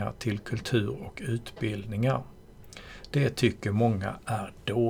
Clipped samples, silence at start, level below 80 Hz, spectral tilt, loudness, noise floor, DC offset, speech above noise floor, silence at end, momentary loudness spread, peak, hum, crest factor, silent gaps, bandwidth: under 0.1%; 0 s; -52 dBFS; -6.5 dB/octave; -30 LUFS; -48 dBFS; under 0.1%; 19 dB; 0 s; 16 LU; -10 dBFS; none; 18 dB; none; 16 kHz